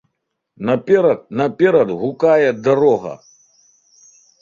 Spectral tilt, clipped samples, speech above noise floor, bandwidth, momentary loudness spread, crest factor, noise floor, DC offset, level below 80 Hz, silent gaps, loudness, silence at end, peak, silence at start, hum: -7 dB/octave; under 0.1%; 59 dB; 7.4 kHz; 8 LU; 16 dB; -75 dBFS; under 0.1%; -60 dBFS; none; -16 LUFS; 1.25 s; -2 dBFS; 0.6 s; none